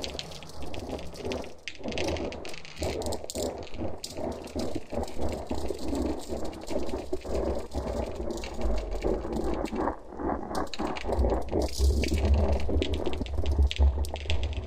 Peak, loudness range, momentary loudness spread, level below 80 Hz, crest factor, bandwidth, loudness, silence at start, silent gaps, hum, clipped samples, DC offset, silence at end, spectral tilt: -12 dBFS; 6 LU; 10 LU; -34 dBFS; 18 dB; 15.5 kHz; -32 LUFS; 0 s; none; none; under 0.1%; under 0.1%; 0 s; -6 dB/octave